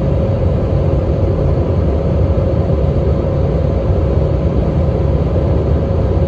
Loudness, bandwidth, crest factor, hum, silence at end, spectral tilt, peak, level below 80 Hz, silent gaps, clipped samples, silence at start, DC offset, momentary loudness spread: -15 LUFS; 6.6 kHz; 12 dB; none; 0 s; -10.5 dB/octave; -2 dBFS; -18 dBFS; none; under 0.1%; 0 s; under 0.1%; 1 LU